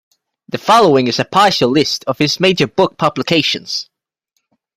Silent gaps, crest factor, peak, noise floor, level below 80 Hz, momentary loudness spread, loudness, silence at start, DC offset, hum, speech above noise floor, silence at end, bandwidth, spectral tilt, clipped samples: none; 14 dB; 0 dBFS; -70 dBFS; -54 dBFS; 10 LU; -13 LUFS; 0.55 s; under 0.1%; none; 57 dB; 0.95 s; 15.5 kHz; -4.5 dB/octave; under 0.1%